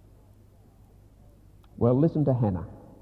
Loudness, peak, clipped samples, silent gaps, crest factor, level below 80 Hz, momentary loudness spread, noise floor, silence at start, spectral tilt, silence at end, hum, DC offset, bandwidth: -25 LUFS; -10 dBFS; under 0.1%; none; 18 dB; -50 dBFS; 12 LU; -55 dBFS; 1.8 s; -12 dB/octave; 0.25 s; none; under 0.1%; 4.9 kHz